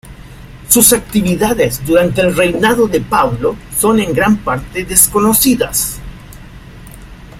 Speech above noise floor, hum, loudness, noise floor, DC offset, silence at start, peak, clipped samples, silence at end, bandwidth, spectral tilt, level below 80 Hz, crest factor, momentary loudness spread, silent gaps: 21 dB; none; -12 LUFS; -33 dBFS; under 0.1%; 0.05 s; 0 dBFS; 0.2%; 0 s; 16.5 kHz; -3.5 dB/octave; -34 dBFS; 14 dB; 8 LU; none